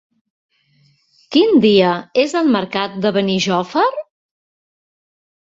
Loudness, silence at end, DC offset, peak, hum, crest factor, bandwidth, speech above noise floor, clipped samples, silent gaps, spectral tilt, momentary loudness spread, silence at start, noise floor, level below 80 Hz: -15 LUFS; 1.55 s; under 0.1%; -2 dBFS; none; 16 dB; 7.8 kHz; 42 dB; under 0.1%; none; -5.5 dB/octave; 7 LU; 1.3 s; -57 dBFS; -60 dBFS